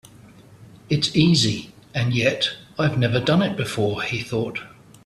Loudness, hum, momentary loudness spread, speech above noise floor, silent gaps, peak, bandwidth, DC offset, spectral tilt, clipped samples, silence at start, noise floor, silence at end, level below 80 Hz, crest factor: -21 LUFS; none; 10 LU; 26 dB; none; -4 dBFS; 13.5 kHz; under 0.1%; -5 dB/octave; under 0.1%; 0.5 s; -47 dBFS; 0.4 s; -52 dBFS; 18 dB